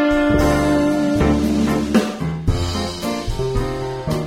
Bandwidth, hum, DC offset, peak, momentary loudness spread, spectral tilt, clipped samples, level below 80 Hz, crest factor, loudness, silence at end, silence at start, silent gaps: 16 kHz; none; under 0.1%; -2 dBFS; 7 LU; -6 dB/octave; under 0.1%; -28 dBFS; 16 dB; -19 LUFS; 0 s; 0 s; none